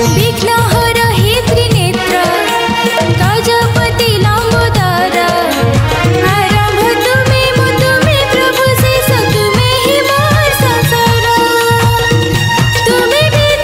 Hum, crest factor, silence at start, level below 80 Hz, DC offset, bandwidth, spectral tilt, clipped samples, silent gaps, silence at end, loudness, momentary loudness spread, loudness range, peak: none; 10 dB; 0 s; -26 dBFS; under 0.1%; 16.5 kHz; -4.5 dB/octave; under 0.1%; none; 0 s; -10 LUFS; 2 LU; 1 LU; 0 dBFS